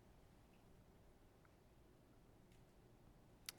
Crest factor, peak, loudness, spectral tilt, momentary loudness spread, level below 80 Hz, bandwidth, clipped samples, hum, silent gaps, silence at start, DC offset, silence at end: 42 dB; -24 dBFS; -66 LUFS; -3 dB/octave; 5 LU; -74 dBFS; 18 kHz; under 0.1%; none; none; 0 s; under 0.1%; 0 s